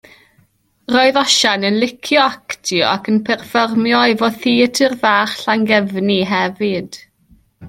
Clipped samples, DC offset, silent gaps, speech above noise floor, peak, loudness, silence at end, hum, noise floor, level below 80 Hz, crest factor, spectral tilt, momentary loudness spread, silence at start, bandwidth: under 0.1%; under 0.1%; none; 42 dB; 0 dBFS; -15 LUFS; 0 s; none; -57 dBFS; -58 dBFS; 16 dB; -3.5 dB/octave; 7 LU; 0.9 s; 16 kHz